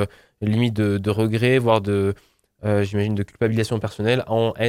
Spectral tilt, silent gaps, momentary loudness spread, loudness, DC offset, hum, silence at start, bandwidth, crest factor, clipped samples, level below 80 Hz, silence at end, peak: -7 dB/octave; none; 7 LU; -21 LUFS; under 0.1%; none; 0 s; 14.5 kHz; 20 dB; under 0.1%; -54 dBFS; 0 s; -2 dBFS